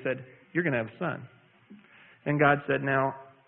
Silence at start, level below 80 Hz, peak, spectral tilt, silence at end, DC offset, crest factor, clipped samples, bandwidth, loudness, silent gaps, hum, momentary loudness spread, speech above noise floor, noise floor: 0 s; -66 dBFS; -10 dBFS; -11 dB/octave; 0.25 s; under 0.1%; 20 dB; under 0.1%; 3.9 kHz; -28 LUFS; none; none; 13 LU; 27 dB; -55 dBFS